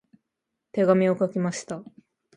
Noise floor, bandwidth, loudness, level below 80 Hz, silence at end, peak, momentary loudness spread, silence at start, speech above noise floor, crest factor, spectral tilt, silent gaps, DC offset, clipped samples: -83 dBFS; 11 kHz; -24 LUFS; -72 dBFS; 0.55 s; -6 dBFS; 16 LU; 0.75 s; 60 dB; 20 dB; -6.5 dB/octave; none; under 0.1%; under 0.1%